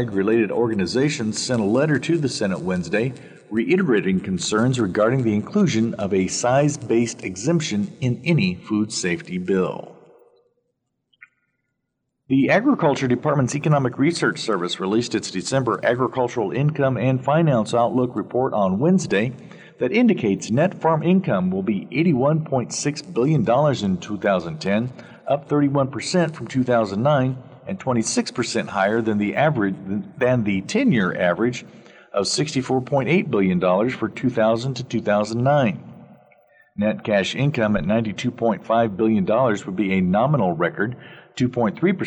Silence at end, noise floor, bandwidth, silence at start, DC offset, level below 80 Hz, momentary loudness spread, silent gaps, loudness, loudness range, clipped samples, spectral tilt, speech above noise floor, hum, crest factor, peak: 0 s; -76 dBFS; 10.5 kHz; 0 s; under 0.1%; -56 dBFS; 6 LU; none; -21 LUFS; 2 LU; under 0.1%; -6 dB/octave; 56 dB; none; 16 dB; -6 dBFS